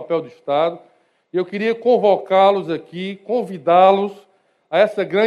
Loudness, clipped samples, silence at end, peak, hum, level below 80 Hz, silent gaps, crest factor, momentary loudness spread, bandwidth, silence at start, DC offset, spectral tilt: -18 LUFS; under 0.1%; 0 s; 0 dBFS; none; -74 dBFS; none; 18 dB; 13 LU; 10 kHz; 0 s; under 0.1%; -7 dB/octave